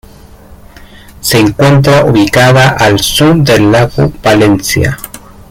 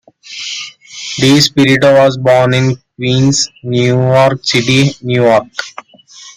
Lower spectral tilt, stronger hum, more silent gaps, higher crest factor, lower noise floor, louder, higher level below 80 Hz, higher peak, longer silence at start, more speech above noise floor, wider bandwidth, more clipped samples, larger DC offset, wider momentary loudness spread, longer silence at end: about the same, -5 dB/octave vs -5 dB/octave; neither; neither; about the same, 8 dB vs 12 dB; about the same, -34 dBFS vs -37 dBFS; first, -7 LUFS vs -10 LUFS; first, -30 dBFS vs -48 dBFS; about the same, 0 dBFS vs 0 dBFS; first, 0.5 s vs 0.25 s; about the same, 27 dB vs 27 dB; about the same, 16.5 kHz vs 15.5 kHz; neither; neither; second, 6 LU vs 15 LU; first, 0.3 s vs 0.05 s